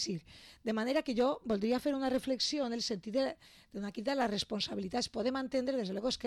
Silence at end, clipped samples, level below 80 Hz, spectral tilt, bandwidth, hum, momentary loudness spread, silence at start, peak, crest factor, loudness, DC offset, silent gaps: 0 s; under 0.1%; -64 dBFS; -4 dB/octave; 13.5 kHz; none; 10 LU; 0 s; -22 dBFS; 12 dB; -35 LUFS; under 0.1%; none